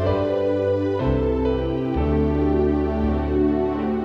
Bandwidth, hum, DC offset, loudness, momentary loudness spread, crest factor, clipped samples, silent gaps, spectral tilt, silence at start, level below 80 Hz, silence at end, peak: 6.2 kHz; none; under 0.1%; -22 LUFS; 3 LU; 12 dB; under 0.1%; none; -9.5 dB/octave; 0 s; -30 dBFS; 0 s; -8 dBFS